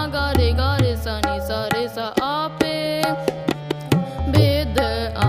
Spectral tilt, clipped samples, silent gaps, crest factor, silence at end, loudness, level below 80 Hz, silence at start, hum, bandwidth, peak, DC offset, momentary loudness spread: -6 dB/octave; under 0.1%; none; 20 dB; 0 s; -21 LUFS; -30 dBFS; 0 s; none; 15.5 kHz; 0 dBFS; under 0.1%; 6 LU